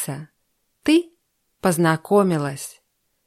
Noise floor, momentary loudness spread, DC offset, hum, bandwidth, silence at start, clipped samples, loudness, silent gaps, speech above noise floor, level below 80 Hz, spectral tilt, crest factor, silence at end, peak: -70 dBFS; 17 LU; under 0.1%; none; 15 kHz; 0 s; under 0.1%; -20 LUFS; none; 51 dB; -62 dBFS; -5.5 dB/octave; 18 dB; 0.55 s; -4 dBFS